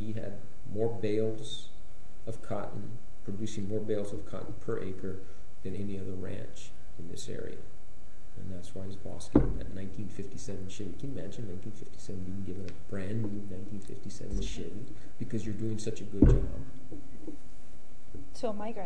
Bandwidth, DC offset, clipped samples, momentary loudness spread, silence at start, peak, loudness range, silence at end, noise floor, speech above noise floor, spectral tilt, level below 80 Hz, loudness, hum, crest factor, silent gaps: 10.5 kHz; 5%; under 0.1%; 18 LU; 0 s; -8 dBFS; 9 LU; 0 s; -55 dBFS; 20 dB; -7 dB/octave; -42 dBFS; -36 LUFS; none; 28 dB; none